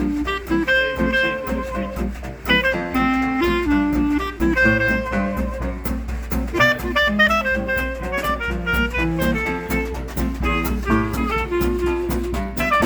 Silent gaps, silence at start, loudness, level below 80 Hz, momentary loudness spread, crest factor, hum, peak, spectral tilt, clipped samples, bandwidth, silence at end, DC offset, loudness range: none; 0 s; -20 LUFS; -30 dBFS; 9 LU; 18 dB; none; -2 dBFS; -5.5 dB/octave; under 0.1%; over 20 kHz; 0 s; under 0.1%; 3 LU